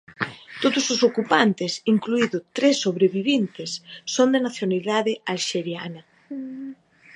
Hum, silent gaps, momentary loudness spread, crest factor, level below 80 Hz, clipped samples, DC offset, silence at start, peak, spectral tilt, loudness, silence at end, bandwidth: none; none; 15 LU; 20 dB; -74 dBFS; under 0.1%; under 0.1%; 0.1 s; -4 dBFS; -4 dB/octave; -22 LUFS; 0.4 s; 10.5 kHz